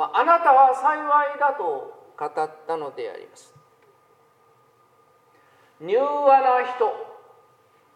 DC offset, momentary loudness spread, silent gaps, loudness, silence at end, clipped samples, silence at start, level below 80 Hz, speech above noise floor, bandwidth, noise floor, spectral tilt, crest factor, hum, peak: under 0.1%; 20 LU; none; -20 LUFS; 0.85 s; under 0.1%; 0 s; -90 dBFS; 38 dB; 10 kHz; -59 dBFS; -4 dB/octave; 20 dB; none; -4 dBFS